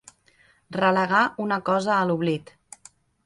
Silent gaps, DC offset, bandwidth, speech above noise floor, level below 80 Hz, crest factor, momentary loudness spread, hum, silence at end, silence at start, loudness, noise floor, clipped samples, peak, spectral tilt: none; under 0.1%; 11.5 kHz; 38 dB; -66 dBFS; 18 dB; 8 LU; none; 0.85 s; 0.7 s; -23 LUFS; -60 dBFS; under 0.1%; -6 dBFS; -6 dB/octave